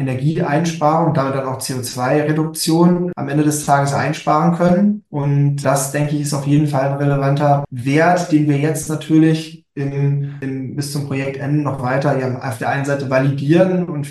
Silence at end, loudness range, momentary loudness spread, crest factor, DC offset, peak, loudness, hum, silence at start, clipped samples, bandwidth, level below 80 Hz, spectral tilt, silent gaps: 0 s; 4 LU; 8 LU; 14 dB; under 0.1%; -2 dBFS; -17 LUFS; none; 0 s; under 0.1%; 12.5 kHz; -54 dBFS; -6.5 dB/octave; none